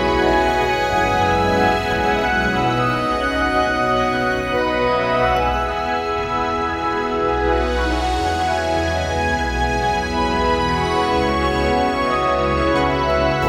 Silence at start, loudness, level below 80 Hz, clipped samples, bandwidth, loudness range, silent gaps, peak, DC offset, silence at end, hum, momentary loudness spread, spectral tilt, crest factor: 0 s; -18 LUFS; -30 dBFS; under 0.1%; 16 kHz; 2 LU; none; -2 dBFS; under 0.1%; 0 s; none; 4 LU; -5.5 dB/octave; 16 dB